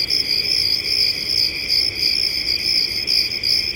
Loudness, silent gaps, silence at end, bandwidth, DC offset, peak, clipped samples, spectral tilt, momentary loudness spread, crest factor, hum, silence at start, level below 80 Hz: -16 LUFS; none; 0 s; 17 kHz; under 0.1%; -4 dBFS; under 0.1%; -0.5 dB/octave; 2 LU; 14 dB; none; 0 s; -46 dBFS